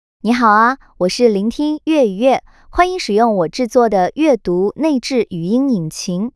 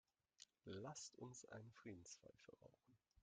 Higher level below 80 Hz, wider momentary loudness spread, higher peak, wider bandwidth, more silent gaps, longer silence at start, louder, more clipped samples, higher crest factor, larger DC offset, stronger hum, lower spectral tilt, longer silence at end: first, -42 dBFS vs -88 dBFS; second, 7 LU vs 13 LU; first, 0 dBFS vs -40 dBFS; first, 12 kHz vs 9.4 kHz; neither; second, 0.25 s vs 0.4 s; first, -15 LUFS vs -59 LUFS; neither; second, 14 dB vs 20 dB; neither; neither; first, -5.5 dB/octave vs -4 dB/octave; about the same, 0.05 s vs 0 s